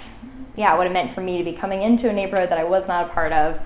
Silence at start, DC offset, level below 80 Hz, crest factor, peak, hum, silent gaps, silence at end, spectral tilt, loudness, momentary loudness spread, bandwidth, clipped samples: 0 s; under 0.1%; -42 dBFS; 18 dB; -4 dBFS; none; none; 0 s; -9.5 dB/octave; -21 LUFS; 7 LU; 4 kHz; under 0.1%